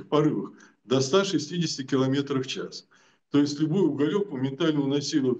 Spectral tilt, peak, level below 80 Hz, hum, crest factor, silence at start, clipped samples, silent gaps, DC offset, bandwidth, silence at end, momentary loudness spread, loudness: -5.5 dB/octave; -10 dBFS; -74 dBFS; none; 16 dB; 0 s; under 0.1%; none; under 0.1%; 8.4 kHz; 0 s; 9 LU; -26 LUFS